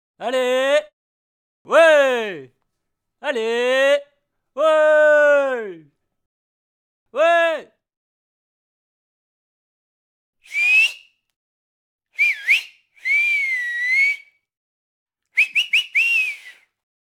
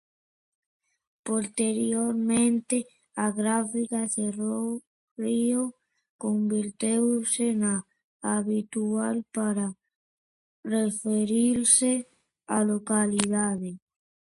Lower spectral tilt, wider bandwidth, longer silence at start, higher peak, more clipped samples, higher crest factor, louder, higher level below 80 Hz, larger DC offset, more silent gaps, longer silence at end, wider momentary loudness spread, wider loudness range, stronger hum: second, -1 dB/octave vs -4 dB/octave; first, 16 kHz vs 11.5 kHz; second, 0.2 s vs 1.25 s; first, -2 dBFS vs -6 dBFS; neither; about the same, 18 dB vs 22 dB; first, -17 LUFS vs -26 LUFS; second, -82 dBFS vs -68 dBFS; neither; first, 0.93-1.65 s, 6.26-7.06 s, 7.97-10.33 s, 11.36-11.99 s, 14.57-15.06 s vs 4.87-5.16 s, 6.09-6.19 s, 8.04-8.20 s, 9.95-10.63 s; about the same, 0.55 s vs 0.45 s; first, 15 LU vs 9 LU; about the same, 6 LU vs 4 LU; neither